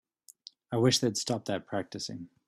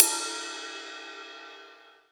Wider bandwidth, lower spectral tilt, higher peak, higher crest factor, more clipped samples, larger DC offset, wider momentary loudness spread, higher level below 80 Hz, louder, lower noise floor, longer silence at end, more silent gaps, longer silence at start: second, 14 kHz vs over 20 kHz; first, -4.5 dB/octave vs 2.5 dB/octave; second, -12 dBFS vs 0 dBFS; second, 20 dB vs 32 dB; neither; neither; about the same, 16 LU vs 18 LU; first, -68 dBFS vs under -90 dBFS; about the same, -30 LUFS vs -31 LUFS; about the same, -55 dBFS vs -53 dBFS; about the same, 0.2 s vs 0.2 s; neither; first, 0.7 s vs 0 s